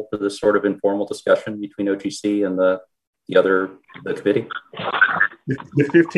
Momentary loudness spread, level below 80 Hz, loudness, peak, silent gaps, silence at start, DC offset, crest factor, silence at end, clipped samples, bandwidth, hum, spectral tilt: 12 LU; -64 dBFS; -20 LUFS; -2 dBFS; 3.07-3.13 s; 0 s; under 0.1%; 18 dB; 0 s; under 0.1%; 12 kHz; none; -6 dB/octave